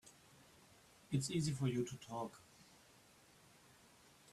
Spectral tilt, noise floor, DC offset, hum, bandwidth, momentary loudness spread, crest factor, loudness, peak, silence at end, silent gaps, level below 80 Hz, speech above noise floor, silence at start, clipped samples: -5.5 dB/octave; -67 dBFS; under 0.1%; none; 14 kHz; 26 LU; 20 dB; -42 LUFS; -26 dBFS; 1.7 s; none; -74 dBFS; 26 dB; 0.05 s; under 0.1%